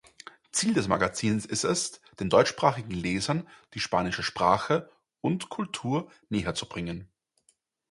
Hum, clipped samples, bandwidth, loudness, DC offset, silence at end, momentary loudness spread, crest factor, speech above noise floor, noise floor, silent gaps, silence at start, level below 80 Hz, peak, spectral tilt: none; under 0.1%; 11.5 kHz; -28 LUFS; under 0.1%; 0.85 s; 11 LU; 22 dB; 42 dB; -70 dBFS; none; 0.55 s; -54 dBFS; -6 dBFS; -4.5 dB/octave